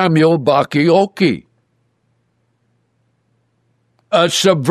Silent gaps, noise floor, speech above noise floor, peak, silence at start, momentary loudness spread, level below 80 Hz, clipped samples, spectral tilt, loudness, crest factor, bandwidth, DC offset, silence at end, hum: none; -63 dBFS; 50 dB; -2 dBFS; 0 s; 5 LU; -62 dBFS; under 0.1%; -5 dB/octave; -14 LUFS; 14 dB; 13.5 kHz; under 0.1%; 0 s; 60 Hz at -55 dBFS